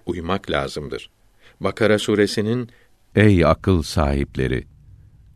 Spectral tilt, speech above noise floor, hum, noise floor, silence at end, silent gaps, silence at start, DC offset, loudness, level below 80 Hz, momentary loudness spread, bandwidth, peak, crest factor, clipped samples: -6.5 dB/octave; 28 dB; none; -47 dBFS; 0.75 s; none; 0.05 s; under 0.1%; -20 LUFS; -34 dBFS; 12 LU; 13.5 kHz; 0 dBFS; 20 dB; under 0.1%